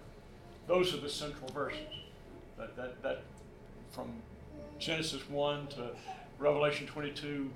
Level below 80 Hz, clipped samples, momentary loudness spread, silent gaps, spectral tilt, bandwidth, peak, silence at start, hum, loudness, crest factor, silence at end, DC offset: -58 dBFS; under 0.1%; 22 LU; none; -4.5 dB/octave; 16.5 kHz; -18 dBFS; 0 s; none; -37 LUFS; 20 dB; 0 s; under 0.1%